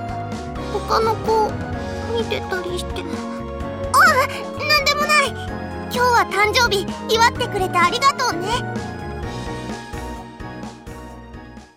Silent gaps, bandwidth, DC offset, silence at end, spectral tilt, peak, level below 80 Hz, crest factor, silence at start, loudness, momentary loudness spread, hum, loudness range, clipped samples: none; 16.5 kHz; 0.1%; 0.1 s; -3.5 dB/octave; -4 dBFS; -38 dBFS; 16 dB; 0 s; -19 LUFS; 18 LU; none; 6 LU; under 0.1%